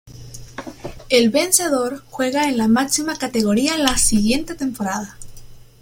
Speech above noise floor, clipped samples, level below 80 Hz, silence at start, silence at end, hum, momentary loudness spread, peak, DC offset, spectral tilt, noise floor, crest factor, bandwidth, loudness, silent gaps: 20 dB; under 0.1%; -40 dBFS; 0.05 s; 0.2 s; none; 19 LU; 0 dBFS; under 0.1%; -3 dB/octave; -38 dBFS; 20 dB; 16.5 kHz; -18 LUFS; none